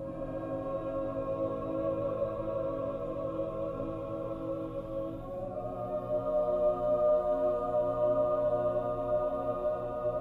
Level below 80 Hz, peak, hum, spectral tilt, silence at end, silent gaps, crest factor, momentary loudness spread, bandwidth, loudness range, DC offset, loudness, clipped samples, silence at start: -52 dBFS; -18 dBFS; none; -9.5 dB/octave; 0 s; none; 14 dB; 9 LU; 4.2 kHz; 7 LU; under 0.1%; -33 LUFS; under 0.1%; 0 s